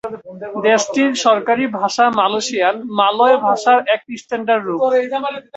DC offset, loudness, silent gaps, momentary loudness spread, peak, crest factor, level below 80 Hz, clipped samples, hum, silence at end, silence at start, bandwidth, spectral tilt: under 0.1%; -16 LUFS; none; 9 LU; -2 dBFS; 14 dB; -64 dBFS; under 0.1%; none; 0.15 s; 0.05 s; 8.2 kHz; -3 dB/octave